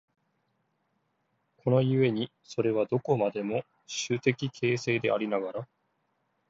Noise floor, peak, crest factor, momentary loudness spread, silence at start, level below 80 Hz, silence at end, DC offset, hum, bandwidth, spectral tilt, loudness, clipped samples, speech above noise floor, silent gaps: -76 dBFS; -8 dBFS; 22 dB; 10 LU; 1.65 s; -72 dBFS; 0.85 s; under 0.1%; none; 7.8 kHz; -6 dB/octave; -29 LUFS; under 0.1%; 48 dB; none